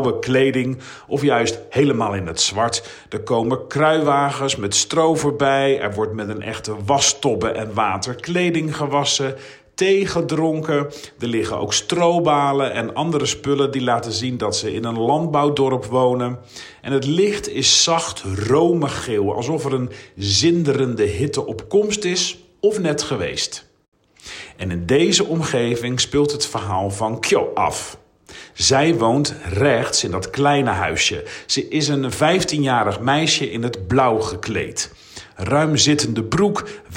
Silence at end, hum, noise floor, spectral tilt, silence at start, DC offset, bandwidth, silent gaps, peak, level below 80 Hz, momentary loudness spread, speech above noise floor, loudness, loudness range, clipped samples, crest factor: 0 s; none; -42 dBFS; -4 dB/octave; 0 s; under 0.1%; 16 kHz; 23.88-23.92 s; -2 dBFS; -48 dBFS; 10 LU; 23 dB; -19 LUFS; 2 LU; under 0.1%; 16 dB